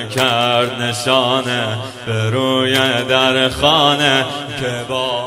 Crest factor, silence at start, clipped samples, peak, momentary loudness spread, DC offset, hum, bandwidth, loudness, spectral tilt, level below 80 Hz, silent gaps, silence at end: 16 dB; 0 s; under 0.1%; 0 dBFS; 10 LU; under 0.1%; none; 16.5 kHz; -15 LUFS; -4 dB/octave; -46 dBFS; none; 0 s